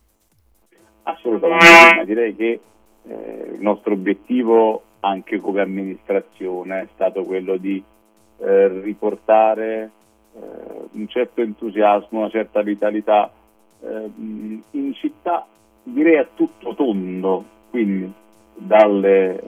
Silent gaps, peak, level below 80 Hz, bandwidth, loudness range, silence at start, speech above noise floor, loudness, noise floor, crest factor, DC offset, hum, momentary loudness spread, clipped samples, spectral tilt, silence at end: none; 0 dBFS; -60 dBFS; 19.5 kHz; 10 LU; 1.05 s; 43 dB; -16 LUFS; -60 dBFS; 18 dB; under 0.1%; none; 18 LU; under 0.1%; -4.5 dB/octave; 0 s